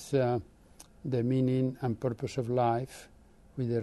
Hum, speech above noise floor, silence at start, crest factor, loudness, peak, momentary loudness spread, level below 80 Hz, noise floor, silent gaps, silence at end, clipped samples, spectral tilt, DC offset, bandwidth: none; 26 dB; 0 s; 16 dB; -31 LUFS; -16 dBFS; 15 LU; -60 dBFS; -56 dBFS; none; 0 s; under 0.1%; -8 dB/octave; under 0.1%; 12 kHz